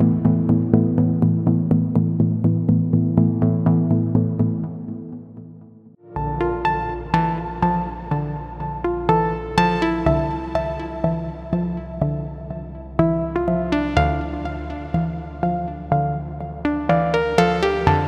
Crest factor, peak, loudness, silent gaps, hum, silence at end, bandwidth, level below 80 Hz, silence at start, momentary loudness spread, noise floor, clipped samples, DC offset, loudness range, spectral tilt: 20 dB; 0 dBFS; -21 LUFS; none; none; 0 s; 8.4 kHz; -36 dBFS; 0 s; 11 LU; -45 dBFS; under 0.1%; under 0.1%; 6 LU; -8.5 dB/octave